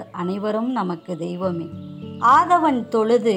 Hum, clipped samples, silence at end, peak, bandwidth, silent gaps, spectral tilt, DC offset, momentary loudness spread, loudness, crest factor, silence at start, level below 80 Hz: none; under 0.1%; 0 s; -6 dBFS; 11 kHz; none; -6.5 dB/octave; under 0.1%; 15 LU; -20 LUFS; 14 dB; 0 s; -66 dBFS